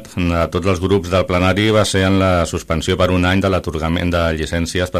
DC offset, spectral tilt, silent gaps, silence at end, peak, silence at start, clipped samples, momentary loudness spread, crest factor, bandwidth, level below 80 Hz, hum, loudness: under 0.1%; -5.5 dB/octave; none; 0 s; -2 dBFS; 0 s; under 0.1%; 5 LU; 14 dB; 14 kHz; -32 dBFS; none; -16 LUFS